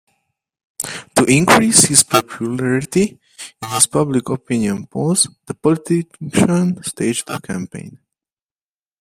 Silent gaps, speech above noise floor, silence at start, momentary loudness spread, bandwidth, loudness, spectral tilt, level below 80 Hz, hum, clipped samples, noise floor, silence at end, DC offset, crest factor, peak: none; over 73 dB; 0.8 s; 16 LU; 16 kHz; -16 LUFS; -3.5 dB/octave; -52 dBFS; none; under 0.1%; under -90 dBFS; 1.05 s; under 0.1%; 18 dB; 0 dBFS